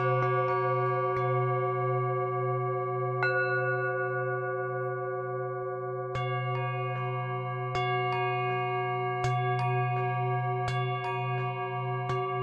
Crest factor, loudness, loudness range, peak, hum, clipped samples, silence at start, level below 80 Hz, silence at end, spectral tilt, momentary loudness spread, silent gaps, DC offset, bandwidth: 16 dB; -30 LUFS; 4 LU; -14 dBFS; none; under 0.1%; 0 s; -64 dBFS; 0 s; -7.5 dB/octave; 6 LU; none; under 0.1%; 7.8 kHz